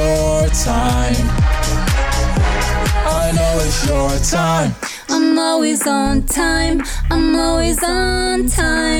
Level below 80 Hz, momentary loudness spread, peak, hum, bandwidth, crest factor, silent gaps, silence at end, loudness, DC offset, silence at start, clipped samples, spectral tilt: -20 dBFS; 3 LU; -6 dBFS; none; 18.5 kHz; 10 dB; none; 0 s; -16 LUFS; under 0.1%; 0 s; under 0.1%; -4.5 dB/octave